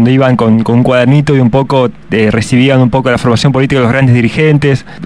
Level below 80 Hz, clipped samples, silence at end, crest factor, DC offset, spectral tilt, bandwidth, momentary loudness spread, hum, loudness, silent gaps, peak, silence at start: -34 dBFS; 3%; 0 s; 8 dB; 1%; -7 dB/octave; 11 kHz; 3 LU; none; -9 LUFS; none; 0 dBFS; 0 s